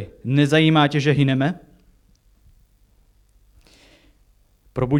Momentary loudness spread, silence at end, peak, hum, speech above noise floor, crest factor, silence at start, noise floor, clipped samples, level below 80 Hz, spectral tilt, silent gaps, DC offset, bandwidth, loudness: 13 LU; 0 s; -4 dBFS; 50 Hz at -60 dBFS; 40 dB; 18 dB; 0 s; -58 dBFS; under 0.1%; -52 dBFS; -7 dB/octave; none; under 0.1%; 11.5 kHz; -18 LUFS